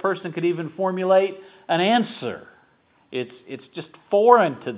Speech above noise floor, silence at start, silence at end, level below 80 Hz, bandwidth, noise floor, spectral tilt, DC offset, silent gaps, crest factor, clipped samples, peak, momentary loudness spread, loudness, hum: 39 dB; 0.05 s; 0 s; -72 dBFS; 4 kHz; -60 dBFS; -9.5 dB/octave; under 0.1%; none; 22 dB; under 0.1%; 0 dBFS; 22 LU; -21 LUFS; none